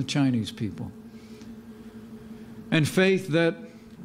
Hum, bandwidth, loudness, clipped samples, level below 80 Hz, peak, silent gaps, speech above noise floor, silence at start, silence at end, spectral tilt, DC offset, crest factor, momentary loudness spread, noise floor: none; 16 kHz; -25 LUFS; under 0.1%; -60 dBFS; -8 dBFS; none; 19 dB; 0 s; 0 s; -6 dB/octave; under 0.1%; 18 dB; 22 LU; -44 dBFS